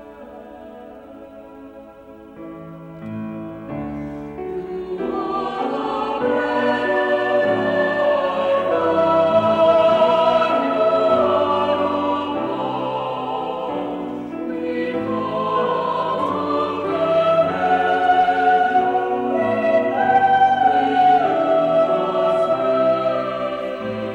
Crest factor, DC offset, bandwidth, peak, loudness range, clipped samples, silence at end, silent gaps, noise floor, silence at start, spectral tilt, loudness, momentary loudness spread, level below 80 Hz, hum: 14 dB; under 0.1%; 8.6 kHz; -6 dBFS; 13 LU; under 0.1%; 0 s; none; -41 dBFS; 0 s; -6.5 dB/octave; -19 LUFS; 16 LU; -54 dBFS; none